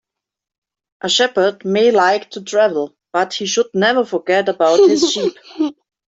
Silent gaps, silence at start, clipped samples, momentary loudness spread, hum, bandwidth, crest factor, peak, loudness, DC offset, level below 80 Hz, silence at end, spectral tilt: none; 1.05 s; under 0.1%; 11 LU; none; 8 kHz; 14 dB; -2 dBFS; -16 LUFS; under 0.1%; -64 dBFS; 0.35 s; -3 dB/octave